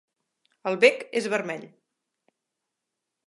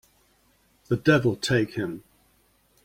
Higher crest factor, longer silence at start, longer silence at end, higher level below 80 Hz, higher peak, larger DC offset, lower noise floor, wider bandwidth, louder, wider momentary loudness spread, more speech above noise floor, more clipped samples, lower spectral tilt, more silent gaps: about the same, 26 dB vs 22 dB; second, 0.65 s vs 0.9 s; first, 1.6 s vs 0.85 s; second, -84 dBFS vs -56 dBFS; about the same, -4 dBFS vs -6 dBFS; neither; first, -84 dBFS vs -64 dBFS; second, 11.5 kHz vs 16.5 kHz; about the same, -24 LUFS vs -24 LUFS; about the same, 15 LU vs 13 LU; first, 60 dB vs 41 dB; neither; second, -3.5 dB/octave vs -6 dB/octave; neither